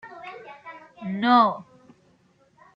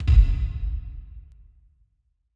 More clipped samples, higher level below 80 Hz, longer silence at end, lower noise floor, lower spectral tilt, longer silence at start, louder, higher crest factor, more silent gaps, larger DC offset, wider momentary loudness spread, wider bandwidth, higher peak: neither; second, -74 dBFS vs -24 dBFS; about the same, 1.15 s vs 1.15 s; second, -61 dBFS vs -70 dBFS; about the same, -7 dB/octave vs -8 dB/octave; about the same, 0.05 s vs 0 s; first, -21 LUFS vs -25 LUFS; about the same, 22 dB vs 18 dB; neither; neither; about the same, 24 LU vs 26 LU; about the same, 5.4 kHz vs 5.4 kHz; about the same, -6 dBFS vs -4 dBFS